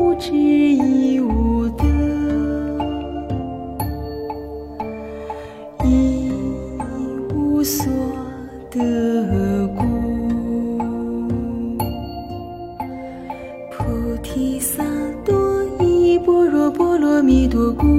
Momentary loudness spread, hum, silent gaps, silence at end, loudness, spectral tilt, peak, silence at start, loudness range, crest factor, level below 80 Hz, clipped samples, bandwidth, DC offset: 15 LU; none; none; 0 s; -19 LUFS; -6.5 dB/octave; -4 dBFS; 0 s; 8 LU; 16 dB; -30 dBFS; under 0.1%; 16.5 kHz; under 0.1%